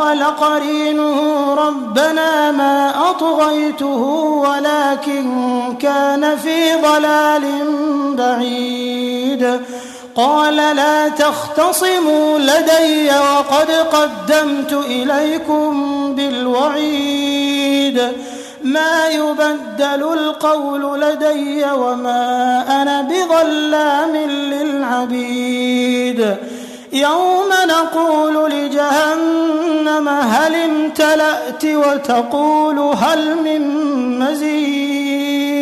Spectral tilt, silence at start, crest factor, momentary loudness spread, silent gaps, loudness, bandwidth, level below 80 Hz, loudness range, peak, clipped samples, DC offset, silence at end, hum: -3 dB/octave; 0 s; 14 dB; 6 LU; none; -15 LUFS; 13.5 kHz; -60 dBFS; 3 LU; -2 dBFS; under 0.1%; under 0.1%; 0 s; none